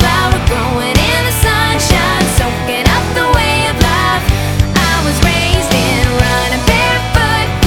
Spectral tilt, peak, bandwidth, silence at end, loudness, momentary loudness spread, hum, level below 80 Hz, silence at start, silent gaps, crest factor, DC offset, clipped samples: -4 dB/octave; 0 dBFS; 19.5 kHz; 0 s; -11 LUFS; 2 LU; none; -18 dBFS; 0 s; none; 12 dB; under 0.1%; 0.3%